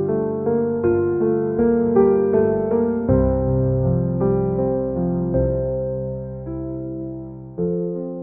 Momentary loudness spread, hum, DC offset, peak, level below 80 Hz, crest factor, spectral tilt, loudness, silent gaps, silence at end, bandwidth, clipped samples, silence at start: 12 LU; none; 0.1%; -4 dBFS; -36 dBFS; 14 dB; -13.5 dB/octave; -20 LUFS; none; 0 s; 2.6 kHz; under 0.1%; 0 s